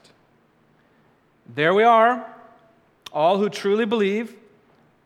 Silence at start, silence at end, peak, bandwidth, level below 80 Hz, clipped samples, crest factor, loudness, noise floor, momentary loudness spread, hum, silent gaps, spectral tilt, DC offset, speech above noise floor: 1.5 s; 0.75 s; -4 dBFS; 12.5 kHz; -76 dBFS; under 0.1%; 18 dB; -20 LUFS; -60 dBFS; 18 LU; none; none; -5.5 dB/octave; under 0.1%; 41 dB